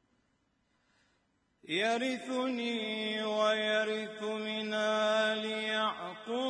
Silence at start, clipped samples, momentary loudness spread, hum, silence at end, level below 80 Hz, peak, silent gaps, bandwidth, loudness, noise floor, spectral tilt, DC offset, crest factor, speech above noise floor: 1.7 s; under 0.1%; 7 LU; none; 0 s; -86 dBFS; -18 dBFS; none; 10.5 kHz; -32 LUFS; -76 dBFS; -3.5 dB/octave; under 0.1%; 16 dB; 43 dB